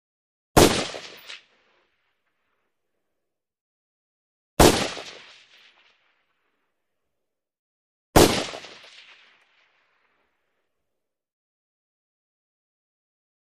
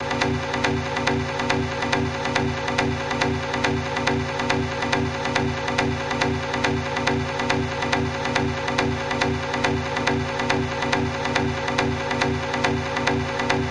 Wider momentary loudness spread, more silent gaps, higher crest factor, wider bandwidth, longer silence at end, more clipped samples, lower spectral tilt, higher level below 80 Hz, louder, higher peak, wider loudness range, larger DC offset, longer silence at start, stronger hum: first, 24 LU vs 0 LU; first, 3.61-4.57 s, 7.59-8.13 s vs none; first, 26 dB vs 18 dB; first, 13 kHz vs 11 kHz; first, 4.85 s vs 0 s; neither; about the same, -4 dB/octave vs -5 dB/octave; about the same, -40 dBFS vs -44 dBFS; first, -20 LUFS vs -23 LUFS; first, -2 dBFS vs -6 dBFS; first, 10 LU vs 0 LU; neither; first, 0.55 s vs 0 s; neither